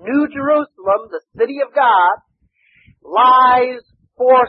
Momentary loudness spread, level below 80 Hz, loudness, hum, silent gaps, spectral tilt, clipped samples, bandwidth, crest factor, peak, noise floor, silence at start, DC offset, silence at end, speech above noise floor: 11 LU; -58 dBFS; -15 LUFS; none; none; -8.5 dB/octave; under 0.1%; 5.4 kHz; 14 dB; -2 dBFS; -59 dBFS; 0.05 s; under 0.1%; 0 s; 46 dB